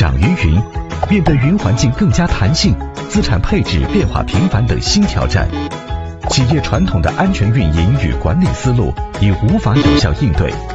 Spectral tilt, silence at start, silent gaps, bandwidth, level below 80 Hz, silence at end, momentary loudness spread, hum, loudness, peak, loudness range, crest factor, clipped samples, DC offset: -6 dB/octave; 0 s; none; 8.4 kHz; -22 dBFS; 0 s; 6 LU; none; -14 LUFS; 0 dBFS; 1 LU; 12 dB; under 0.1%; under 0.1%